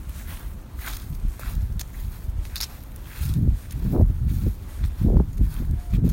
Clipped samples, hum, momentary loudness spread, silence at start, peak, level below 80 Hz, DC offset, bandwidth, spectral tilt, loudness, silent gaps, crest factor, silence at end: under 0.1%; none; 15 LU; 0 s; -4 dBFS; -26 dBFS; under 0.1%; 16.5 kHz; -7 dB/octave; -26 LUFS; none; 20 dB; 0 s